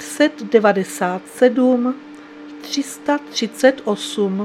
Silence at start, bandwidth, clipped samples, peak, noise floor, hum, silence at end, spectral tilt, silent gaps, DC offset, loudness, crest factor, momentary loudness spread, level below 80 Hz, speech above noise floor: 0 s; 15.5 kHz; under 0.1%; 0 dBFS; -37 dBFS; none; 0 s; -4.5 dB/octave; none; under 0.1%; -18 LUFS; 18 dB; 17 LU; -68 dBFS; 19 dB